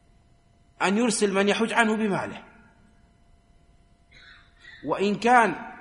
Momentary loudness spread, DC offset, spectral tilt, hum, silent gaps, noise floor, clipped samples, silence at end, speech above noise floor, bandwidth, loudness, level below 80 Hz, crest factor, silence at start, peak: 13 LU; under 0.1%; -4 dB/octave; none; none; -59 dBFS; under 0.1%; 0 s; 36 dB; 11.5 kHz; -23 LUFS; -60 dBFS; 22 dB; 0.8 s; -4 dBFS